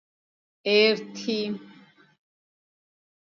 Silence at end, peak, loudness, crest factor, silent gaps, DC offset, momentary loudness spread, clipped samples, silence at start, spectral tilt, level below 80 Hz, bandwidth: 1.6 s; -8 dBFS; -24 LUFS; 20 dB; none; under 0.1%; 13 LU; under 0.1%; 0.65 s; -4 dB/octave; -82 dBFS; 7.2 kHz